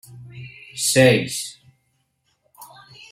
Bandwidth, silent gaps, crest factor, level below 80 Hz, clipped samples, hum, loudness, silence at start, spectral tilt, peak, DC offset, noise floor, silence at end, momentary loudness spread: 16.5 kHz; none; 22 dB; -60 dBFS; under 0.1%; none; -18 LUFS; 0.1 s; -4 dB/octave; -2 dBFS; under 0.1%; -69 dBFS; 0.5 s; 24 LU